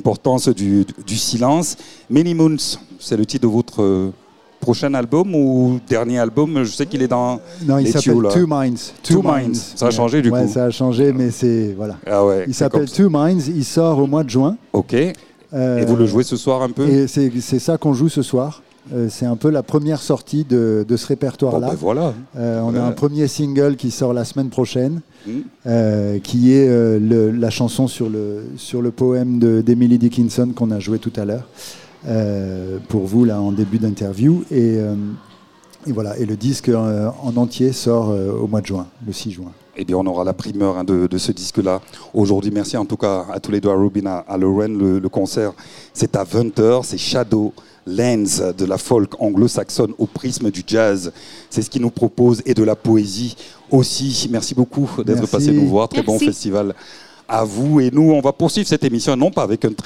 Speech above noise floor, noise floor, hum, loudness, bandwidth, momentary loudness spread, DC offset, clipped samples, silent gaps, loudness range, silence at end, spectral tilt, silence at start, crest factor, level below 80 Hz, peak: 30 dB; -47 dBFS; none; -17 LUFS; 15.5 kHz; 9 LU; 0.3%; under 0.1%; none; 3 LU; 0.05 s; -6 dB/octave; 0 s; 14 dB; -54 dBFS; -2 dBFS